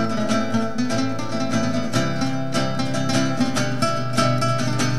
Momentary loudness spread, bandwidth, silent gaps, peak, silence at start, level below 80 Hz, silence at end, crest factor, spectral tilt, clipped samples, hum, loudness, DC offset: 3 LU; 14 kHz; none; -4 dBFS; 0 s; -58 dBFS; 0 s; 18 dB; -5 dB/octave; under 0.1%; none; -22 LUFS; 5%